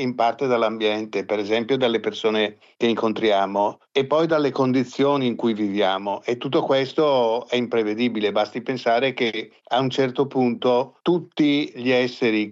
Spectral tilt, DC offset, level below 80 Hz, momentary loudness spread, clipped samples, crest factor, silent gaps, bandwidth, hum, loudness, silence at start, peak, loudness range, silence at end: -6 dB/octave; under 0.1%; -74 dBFS; 5 LU; under 0.1%; 14 dB; none; 7.6 kHz; none; -22 LUFS; 0 s; -8 dBFS; 1 LU; 0 s